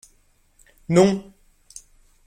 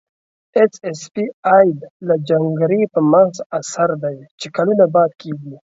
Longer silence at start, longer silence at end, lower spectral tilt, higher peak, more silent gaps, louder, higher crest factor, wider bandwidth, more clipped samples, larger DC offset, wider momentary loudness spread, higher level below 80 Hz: first, 0.9 s vs 0.55 s; first, 1.05 s vs 0.2 s; about the same, -6.5 dB/octave vs -6.5 dB/octave; second, -4 dBFS vs 0 dBFS; second, none vs 1.34-1.43 s, 1.91-2.00 s, 3.46-3.50 s, 4.31-4.38 s; second, -19 LUFS vs -16 LUFS; about the same, 20 dB vs 16 dB; first, 14 kHz vs 8 kHz; neither; neither; first, 26 LU vs 14 LU; first, -56 dBFS vs -64 dBFS